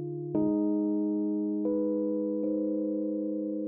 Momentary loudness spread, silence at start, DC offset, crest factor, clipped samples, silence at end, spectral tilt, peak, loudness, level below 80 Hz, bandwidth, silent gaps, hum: 4 LU; 0 s; under 0.1%; 12 dB; under 0.1%; 0 s; -12 dB/octave; -16 dBFS; -30 LUFS; -70 dBFS; 1.6 kHz; none; none